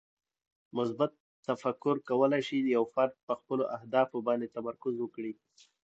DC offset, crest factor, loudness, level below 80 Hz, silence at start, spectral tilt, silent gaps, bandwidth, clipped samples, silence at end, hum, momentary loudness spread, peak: under 0.1%; 20 dB; -32 LUFS; -82 dBFS; 0.75 s; -7 dB/octave; 1.20-1.43 s, 3.23-3.27 s; 8 kHz; under 0.1%; 0.55 s; none; 10 LU; -12 dBFS